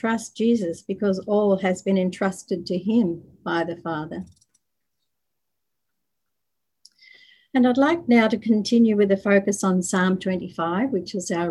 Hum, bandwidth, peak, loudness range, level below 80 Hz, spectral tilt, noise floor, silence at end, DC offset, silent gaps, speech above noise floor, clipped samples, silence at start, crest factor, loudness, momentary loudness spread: none; 12 kHz; -4 dBFS; 13 LU; -62 dBFS; -5.5 dB/octave; -83 dBFS; 0 s; under 0.1%; none; 61 dB; under 0.1%; 0.05 s; 18 dB; -22 LUFS; 10 LU